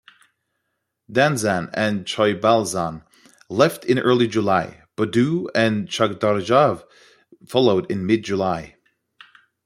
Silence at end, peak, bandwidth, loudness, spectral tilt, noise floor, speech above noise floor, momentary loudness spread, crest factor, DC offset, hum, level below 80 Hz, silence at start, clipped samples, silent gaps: 1 s; -2 dBFS; 16 kHz; -20 LUFS; -5.5 dB/octave; -76 dBFS; 57 dB; 9 LU; 20 dB; under 0.1%; none; -60 dBFS; 1.1 s; under 0.1%; none